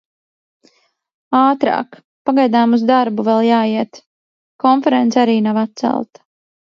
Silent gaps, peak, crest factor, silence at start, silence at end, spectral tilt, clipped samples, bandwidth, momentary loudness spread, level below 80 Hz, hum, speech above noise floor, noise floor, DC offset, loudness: 2.04-2.25 s, 4.07-4.59 s; 0 dBFS; 16 dB; 1.3 s; 0.7 s; -6 dB/octave; under 0.1%; 7 kHz; 9 LU; -68 dBFS; none; 42 dB; -56 dBFS; under 0.1%; -15 LUFS